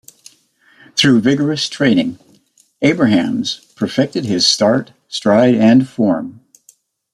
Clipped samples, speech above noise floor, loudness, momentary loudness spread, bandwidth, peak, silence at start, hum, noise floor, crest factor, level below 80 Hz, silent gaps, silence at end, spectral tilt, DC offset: under 0.1%; 40 dB; -14 LUFS; 10 LU; 13 kHz; 0 dBFS; 0.95 s; none; -54 dBFS; 16 dB; -56 dBFS; none; 0.85 s; -5 dB/octave; under 0.1%